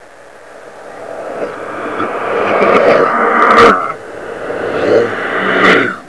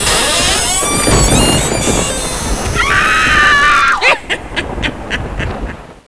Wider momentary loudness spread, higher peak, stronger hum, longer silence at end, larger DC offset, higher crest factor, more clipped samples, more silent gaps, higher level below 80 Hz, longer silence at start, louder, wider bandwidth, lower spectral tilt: first, 18 LU vs 13 LU; about the same, 0 dBFS vs 0 dBFS; neither; about the same, 0 s vs 0 s; second, 0.7% vs 2%; about the same, 12 dB vs 12 dB; first, 0.5% vs under 0.1%; neither; second, -48 dBFS vs -24 dBFS; about the same, 0 s vs 0 s; about the same, -11 LUFS vs -11 LUFS; about the same, 11 kHz vs 11 kHz; first, -5 dB/octave vs -2.5 dB/octave